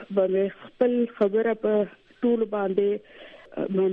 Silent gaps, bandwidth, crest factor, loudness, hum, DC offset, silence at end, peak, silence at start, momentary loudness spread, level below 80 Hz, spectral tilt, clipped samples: none; 4.1 kHz; 14 dB; -25 LUFS; none; under 0.1%; 0 s; -10 dBFS; 0 s; 9 LU; -68 dBFS; -9.5 dB/octave; under 0.1%